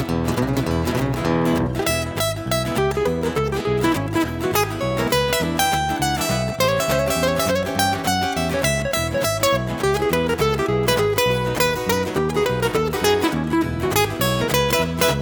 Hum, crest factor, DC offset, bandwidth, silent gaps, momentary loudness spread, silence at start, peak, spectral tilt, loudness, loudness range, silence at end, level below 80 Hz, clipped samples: none; 18 dB; under 0.1%; over 20 kHz; none; 3 LU; 0 s; -2 dBFS; -4.5 dB/octave; -20 LUFS; 2 LU; 0 s; -36 dBFS; under 0.1%